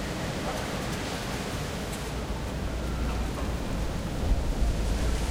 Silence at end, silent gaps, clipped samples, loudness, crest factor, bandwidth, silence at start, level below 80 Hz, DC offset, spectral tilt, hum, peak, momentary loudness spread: 0 s; none; under 0.1%; -32 LUFS; 16 dB; 16 kHz; 0 s; -32 dBFS; under 0.1%; -5 dB/octave; none; -14 dBFS; 4 LU